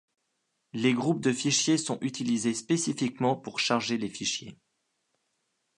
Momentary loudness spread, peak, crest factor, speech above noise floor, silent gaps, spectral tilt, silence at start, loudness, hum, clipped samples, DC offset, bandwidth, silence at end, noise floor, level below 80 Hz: 6 LU; -10 dBFS; 20 dB; 50 dB; none; -3.5 dB/octave; 0.75 s; -28 LUFS; none; under 0.1%; under 0.1%; 11 kHz; 1.25 s; -78 dBFS; -72 dBFS